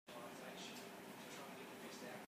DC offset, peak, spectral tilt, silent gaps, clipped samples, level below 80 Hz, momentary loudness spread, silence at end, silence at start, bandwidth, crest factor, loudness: under 0.1%; -38 dBFS; -3 dB/octave; none; under 0.1%; -90 dBFS; 3 LU; 0 s; 0.05 s; 15.5 kHz; 14 dB; -53 LUFS